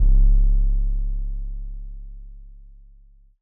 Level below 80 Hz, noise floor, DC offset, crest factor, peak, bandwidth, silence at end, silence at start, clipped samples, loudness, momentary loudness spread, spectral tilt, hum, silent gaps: -20 dBFS; -50 dBFS; under 0.1%; 12 dB; -8 dBFS; 0.7 kHz; 0.95 s; 0 s; under 0.1%; -25 LUFS; 23 LU; -15.5 dB/octave; none; none